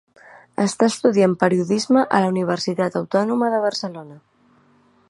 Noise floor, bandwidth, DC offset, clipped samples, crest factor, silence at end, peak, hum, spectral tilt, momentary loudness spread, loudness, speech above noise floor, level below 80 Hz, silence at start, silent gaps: -57 dBFS; 11.5 kHz; under 0.1%; under 0.1%; 20 dB; 0.9 s; 0 dBFS; none; -5.5 dB/octave; 8 LU; -19 LUFS; 38 dB; -66 dBFS; 0.6 s; none